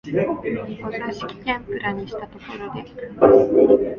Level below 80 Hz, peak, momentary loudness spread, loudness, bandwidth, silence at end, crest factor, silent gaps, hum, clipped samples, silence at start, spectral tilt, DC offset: -50 dBFS; 0 dBFS; 19 LU; -20 LUFS; 7 kHz; 0 s; 20 dB; none; none; under 0.1%; 0.05 s; -8 dB/octave; under 0.1%